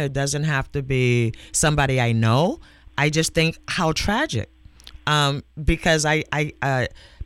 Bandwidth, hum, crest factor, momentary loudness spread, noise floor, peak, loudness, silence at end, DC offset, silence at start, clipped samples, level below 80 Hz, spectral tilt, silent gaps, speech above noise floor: 15.5 kHz; none; 16 dB; 7 LU; -44 dBFS; -6 dBFS; -21 LUFS; 0 s; under 0.1%; 0 s; under 0.1%; -38 dBFS; -4.5 dB/octave; none; 23 dB